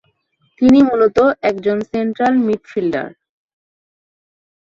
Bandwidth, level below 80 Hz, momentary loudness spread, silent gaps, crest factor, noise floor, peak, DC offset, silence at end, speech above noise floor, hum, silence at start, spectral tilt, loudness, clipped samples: 7.4 kHz; -52 dBFS; 10 LU; none; 16 dB; -63 dBFS; -2 dBFS; under 0.1%; 1.6 s; 48 dB; none; 0.6 s; -7 dB/octave; -15 LUFS; under 0.1%